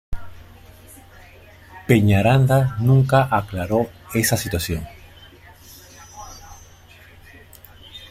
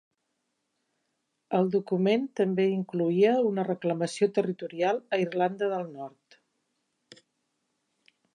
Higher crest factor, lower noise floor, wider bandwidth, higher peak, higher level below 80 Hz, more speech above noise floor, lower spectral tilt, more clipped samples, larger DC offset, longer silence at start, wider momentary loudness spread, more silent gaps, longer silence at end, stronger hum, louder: about the same, 20 dB vs 18 dB; second, -46 dBFS vs -79 dBFS; first, 16 kHz vs 10 kHz; first, -2 dBFS vs -12 dBFS; first, -42 dBFS vs -84 dBFS; second, 29 dB vs 53 dB; about the same, -6 dB/octave vs -6.5 dB/octave; neither; neither; second, 0.1 s vs 1.5 s; first, 24 LU vs 8 LU; neither; second, 0.05 s vs 2.25 s; neither; first, -19 LUFS vs -27 LUFS